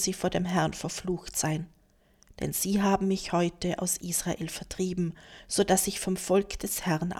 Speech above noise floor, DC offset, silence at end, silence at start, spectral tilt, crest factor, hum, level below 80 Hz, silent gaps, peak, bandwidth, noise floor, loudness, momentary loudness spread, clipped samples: 34 dB; under 0.1%; 0 s; 0 s; -4.5 dB/octave; 20 dB; none; -50 dBFS; none; -10 dBFS; 17.5 kHz; -63 dBFS; -29 LUFS; 9 LU; under 0.1%